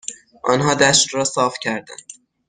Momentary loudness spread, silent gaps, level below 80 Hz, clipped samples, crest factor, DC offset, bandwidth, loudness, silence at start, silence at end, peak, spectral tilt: 20 LU; none; -54 dBFS; under 0.1%; 18 dB; under 0.1%; 10 kHz; -17 LUFS; 0.05 s; 0.35 s; -2 dBFS; -2.5 dB/octave